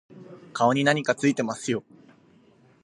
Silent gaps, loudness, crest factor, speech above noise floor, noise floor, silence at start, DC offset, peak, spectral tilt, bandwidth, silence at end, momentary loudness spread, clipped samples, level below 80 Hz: none; -24 LUFS; 22 dB; 34 dB; -58 dBFS; 0.15 s; under 0.1%; -4 dBFS; -5 dB/octave; 11.5 kHz; 1.05 s; 13 LU; under 0.1%; -72 dBFS